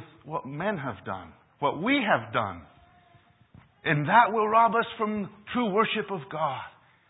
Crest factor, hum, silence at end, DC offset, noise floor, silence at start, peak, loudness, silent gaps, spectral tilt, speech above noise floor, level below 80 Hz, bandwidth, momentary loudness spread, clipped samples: 22 dB; none; 0.4 s; under 0.1%; -60 dBFS; 0 s; -6 dBFS; -26 LUFS; none; -10 dB/octave; 33 dB; -62 dBFS; 4 kHz; 16 LU; under 0.1%